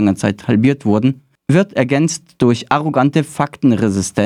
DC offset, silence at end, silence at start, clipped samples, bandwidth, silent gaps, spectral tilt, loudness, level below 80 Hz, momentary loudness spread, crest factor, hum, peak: under 0.1%; 0 s; 0 s; under 0.1%; 14 kHz; none; -6 dB/octave; -15 LUFS; -52 dBFS; 4 LU; 14 dB; none; 0 dBFS